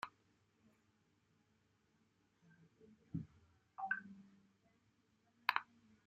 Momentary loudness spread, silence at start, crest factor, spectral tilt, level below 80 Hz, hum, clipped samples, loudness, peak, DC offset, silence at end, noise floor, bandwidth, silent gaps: 21 LU; 0.05 s; 38 dB; -1.5 dB/octave; -80 dBFS; none; under 0.1%; -44 LUFS; -14 dBFS; under 0.1%; 0.45 s; -79 dBFS; 8 kHz; none